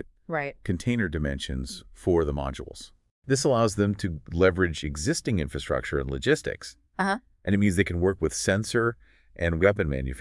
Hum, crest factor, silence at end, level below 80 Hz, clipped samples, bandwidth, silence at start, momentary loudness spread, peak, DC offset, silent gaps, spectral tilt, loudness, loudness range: none; 20 dB; 0 s; -42 dBFS; under 0.1%; 12 kHz; 0 s; 12 LU; -6 dBFS; under 0.1%; 3.11-3.22 s; -5.5 dB/octave; -26 LUFS; 2 LU